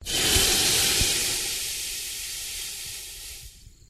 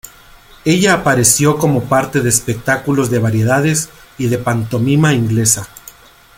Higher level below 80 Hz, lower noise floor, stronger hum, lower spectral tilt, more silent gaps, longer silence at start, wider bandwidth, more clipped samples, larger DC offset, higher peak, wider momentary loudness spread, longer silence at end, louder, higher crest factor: about the same, -40 dBFS vs -44 dBFS; first, -47 dBFS vs -42 dBFS; neither; second, -0.5 dB/octave vs -4.5 dB/octave; neither; about the same, 0 s vs 0.05 s; about the same, 15.5 kHz vs 17 kHz; neither; neither; second, -8 dBFS vs 0 dBFS; first, 17 LU vs 8 LU; second, 0.2 s vs 0.7 s; second, -23 LUFS vs -14 LUFS; first, 20 dB vs 14 dB